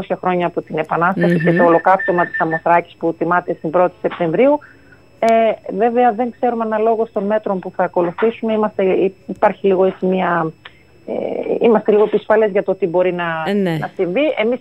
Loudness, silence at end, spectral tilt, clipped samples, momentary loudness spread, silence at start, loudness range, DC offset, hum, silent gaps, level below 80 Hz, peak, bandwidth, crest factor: -16 LUFS; 0 s; -8 dB/octave; under 0.1%; 7 LU; 0 s; 2 LU; 0.2%; none; none; -58 dBFS; -2 dBFS; 10.5 kHz; 14 dB